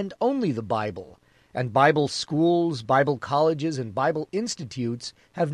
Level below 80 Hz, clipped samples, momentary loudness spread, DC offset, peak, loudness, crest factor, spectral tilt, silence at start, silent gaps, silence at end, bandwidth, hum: -60 dBFS; under 0.1%; 11 LU; under 0.1%; -4 dBFS; -24 LUFS; 20 dB; -5.5 dB/octave; 0 s; none; 0 s; 11.5 kHz; none